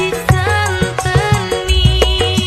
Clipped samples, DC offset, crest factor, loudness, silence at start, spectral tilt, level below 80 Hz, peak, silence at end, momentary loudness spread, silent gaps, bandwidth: under 0.1%; under 0.1%; 14 dB; -14 LUFS; 0 s; -4.5 dB/octave; -20 dBFS; 0 dBFS; 0 s; 4 LU; none; 15.5 kHz